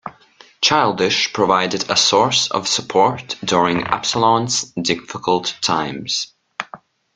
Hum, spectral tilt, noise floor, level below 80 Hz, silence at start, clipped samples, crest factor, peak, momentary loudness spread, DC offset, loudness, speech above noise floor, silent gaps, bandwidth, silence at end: none; -2.5 dB/octave; -49 dBFS; -56 dBFS; 0.05 s; under 0.1%; 18 dB; 0 dBFS; 9 LU; under 0.1%; -17 LUFS; 31 dB; none; 10 kHz; 0.4 s